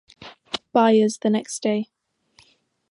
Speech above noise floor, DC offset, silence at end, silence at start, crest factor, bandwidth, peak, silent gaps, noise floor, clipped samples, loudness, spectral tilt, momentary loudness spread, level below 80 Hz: 41 dB; under 0.1%; 1.05 s; 0.2 s; 20 dB; 11.5 kHz; -4 dBFS; none; -61 dBFS; under 0.1%; -21 LUFS; -5 dB/octave; 15 LU; -70 dBFS